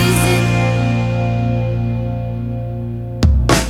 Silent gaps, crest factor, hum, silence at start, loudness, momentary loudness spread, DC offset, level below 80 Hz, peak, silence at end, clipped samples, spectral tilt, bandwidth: none; 16 dB; 60 Hz at -50 dBFS; 0 s; -17 LUFS; 10 LU; under 0.1%; -24 dBFS; 0 dBFS; 0 s; under 0.1%; -5.5 dB/octave; 15.5 kHz